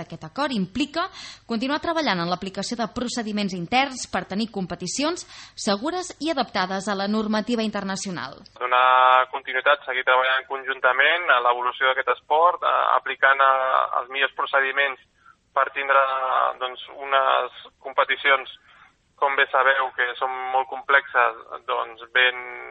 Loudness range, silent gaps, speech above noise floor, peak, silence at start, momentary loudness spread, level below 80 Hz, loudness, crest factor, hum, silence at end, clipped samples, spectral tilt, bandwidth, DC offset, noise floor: 6 LU; none; 32 dB; -2 dBFS; 0 s; 11 LU; -60 dBFS; -22 LUFS; 20 dB; none; 0 s; under 0.1%; -3.5 dB/octave; 8.8 kHz; under 0.1%; -54 dBFS